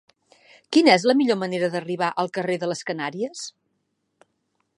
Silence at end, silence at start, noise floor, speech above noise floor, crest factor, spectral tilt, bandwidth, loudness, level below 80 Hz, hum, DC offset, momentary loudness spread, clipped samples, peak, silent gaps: 1.3 s; 0.7 s; -74 dBFS; 52 dB; 22 dB; -4.5 dB/octave; 11 kHz; -22 LUFS; -76 dBFS; none; under 0.1%; 14 LU; under 0.1%; -2 dBFS; none